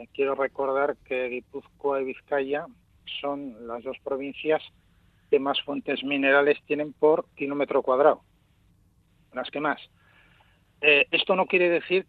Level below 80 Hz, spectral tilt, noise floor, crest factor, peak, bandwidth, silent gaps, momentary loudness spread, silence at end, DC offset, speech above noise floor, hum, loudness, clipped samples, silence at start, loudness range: -66 dBFS; -7 dB/octave; -63 dBFS; 20 dB; -6 dBFS; 4.7 kHz; none; 15 LU; 0.05 s; under 0.1%; 37 dB; none; -25 LUFS; under 0.1%; 0 s; 7 LU